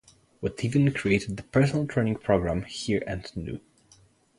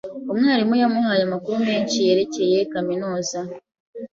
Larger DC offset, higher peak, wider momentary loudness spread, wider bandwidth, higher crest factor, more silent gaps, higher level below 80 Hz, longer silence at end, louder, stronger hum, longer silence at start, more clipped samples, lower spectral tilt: neither; about the same, -8 dBFS vs -6 dBFS; about the same, 12 LU vs 11 LU; first, 11.5 kHz vs 7.6 kHz; first, 20 dB vs 14 dB; second, none vs 3.80-3.93 s; first, -48 dBFS vs -64 dBFS; first, 0.8 s vs 0.05 s; second, -27 LUFS vs -21 LUFS; neither; first, 0.4 s vs 0.05 s; neither; first, -6.5 dB/octave vs -4.5 dB/octave